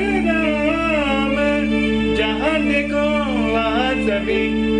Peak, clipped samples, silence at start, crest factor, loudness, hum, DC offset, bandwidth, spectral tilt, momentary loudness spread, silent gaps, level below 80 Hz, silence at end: -8 dBFS; under 0.1%; 0 s; 10 dB; -18 LUFS; none; under 0.1%; 10 kHz; -6 dB/octave; 1 LU; none; -34 dBFS; 0 s